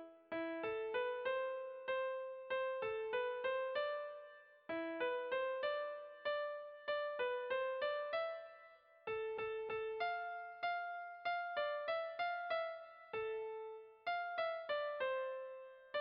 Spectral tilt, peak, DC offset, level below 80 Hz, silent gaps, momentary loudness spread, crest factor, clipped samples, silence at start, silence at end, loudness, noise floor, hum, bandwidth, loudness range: 0 dB/octave; -28 dBFS; under 0.1%; -82 dBFS; none; 8 LU; 14 dB; under 0.1%; 0 s; 0 s; -42 LUFS; -64 dBFS; none; 5.2 kHz; 2 LU